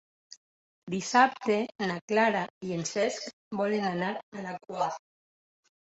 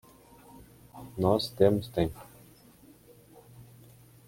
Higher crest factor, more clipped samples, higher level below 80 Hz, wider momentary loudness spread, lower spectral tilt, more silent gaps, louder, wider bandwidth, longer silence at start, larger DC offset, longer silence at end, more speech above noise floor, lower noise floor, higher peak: about the same, 22 dB vs 24 dB; neither; second, -74 dBFS vs -56 dBFS; second, 14 LU vs 25 LU; second, -4.5 dB/octave vs -7 dB/octave; first, 0.37-0.87 s, 2.01-2.08 s, 2.50-2.61 s, 3.33-3.51 s, 4.23-4.32 s vs none; about the same, -29 LUFS vs -28 LUFS; second, 8.2 kHz vs 16.5 kHz; second, 0.3 s vs 0.95 s; neither; first, 0.85 s vs 0.65 s; first, over 61 dB vs 30 dB; first, under -90 dBFS vs -56 dBFS; about the same, -8 dBFS vs -8 dBFS